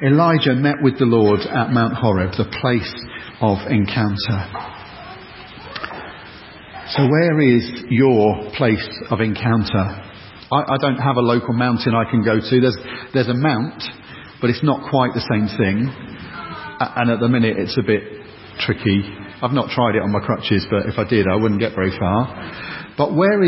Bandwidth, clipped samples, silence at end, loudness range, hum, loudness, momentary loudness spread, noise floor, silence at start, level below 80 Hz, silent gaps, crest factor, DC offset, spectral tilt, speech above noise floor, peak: 5.8 kHz; under 0.1%; 0 s; 4 LU; none; -18 LUFS; 18 LU; -38 dBFS; 0 s; -42 dBFS; none; 16 dB; under 0.1%; -11 dB/octave; 21 dB; -2 dBFS